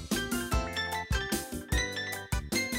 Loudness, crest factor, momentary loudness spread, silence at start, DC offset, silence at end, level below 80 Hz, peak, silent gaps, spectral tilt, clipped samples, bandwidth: -32 LUFS; 14 dB; 3 LU; 0 s; under 0.1%; 0 s; -38 dBFS; -18 dBFS; none; -3.5 dB/octave; under 0.1%; 16 kHz